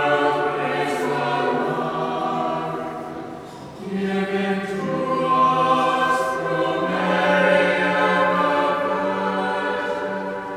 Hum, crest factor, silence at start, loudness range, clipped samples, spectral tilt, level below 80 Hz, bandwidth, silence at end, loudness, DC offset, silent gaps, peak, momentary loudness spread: none; 18 dB; 0 s; 6 LU; under 0.1%; -5.5 dB/octave; -60 dBFS; 15 kHz; 0 s; -21 LUFS; under 0.1%; none; -4 dBFS; 10 LU